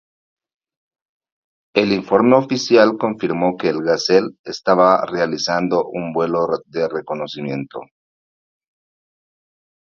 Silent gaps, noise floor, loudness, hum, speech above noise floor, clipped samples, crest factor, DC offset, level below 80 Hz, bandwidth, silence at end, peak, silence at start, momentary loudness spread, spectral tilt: 4.39-4.44 s; under -90 dBFS; -18 LUFS; none; over 73 dB; under 0.1%; 20 dB; under 0.1%; -60 dBFS; 7.4 kHz; 2.15 s; 0 dBFS; 1.75 s; 12 LU; -5.5 dB/octave